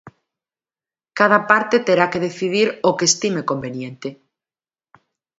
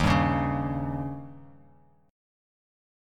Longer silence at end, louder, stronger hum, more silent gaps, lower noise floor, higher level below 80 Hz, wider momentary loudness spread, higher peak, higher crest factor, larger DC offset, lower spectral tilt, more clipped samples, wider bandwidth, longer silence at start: first, 1.25 s vs 0.95 s; first, -17 LUFS vs -28 LUFS; neither; neither; first, under -90 dBFS vs -60 dBFS; second, -64 dBFS vs -42 dBFS; about the same, 15 LU vs 17 LU; first, 0 dBFS vs -10 dBFS; about the same, 20 dB vs 20 dB; neither; second, -3.5 dB/octave vs -7 dB/octave; neither; second, 8 kHz vs 12 kHz; about the same, 0.05 s vs 0 s